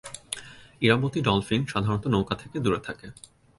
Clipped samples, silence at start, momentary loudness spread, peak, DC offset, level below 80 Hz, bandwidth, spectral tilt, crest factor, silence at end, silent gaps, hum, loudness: under 0.1%; 0.05 s; 14 LU; -6 dBFS; under 0.1%; -52 dBFS; 11.5 kHz; -5.5 dB/octave; 22 dB; 0.45 s; none; none; -26 LUFS